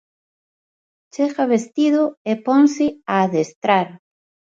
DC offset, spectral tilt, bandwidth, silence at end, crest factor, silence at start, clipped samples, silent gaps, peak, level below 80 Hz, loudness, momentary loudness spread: under 0.1%; -6 dB/octave; 7.8 kHz; 0.55 s; 18 dB; 1.15 s; under 0.1%; 2.17-2.25 s, 3.56-3.62 s; -2 dBFS; -66 dBFS; -18 LUFS; 8 LU